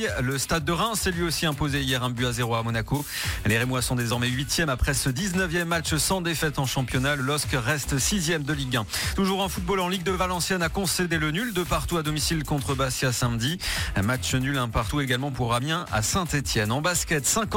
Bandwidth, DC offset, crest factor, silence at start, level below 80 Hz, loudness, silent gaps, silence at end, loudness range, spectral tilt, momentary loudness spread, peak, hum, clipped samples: 17 kHz; under 0.1%; 16 dB; 0 s; -38 dBFS; -25 LUFS; none; 0 s; 1 LU; -4 dB/octave; 3 LU; -10 dBFS; none; under 0.1%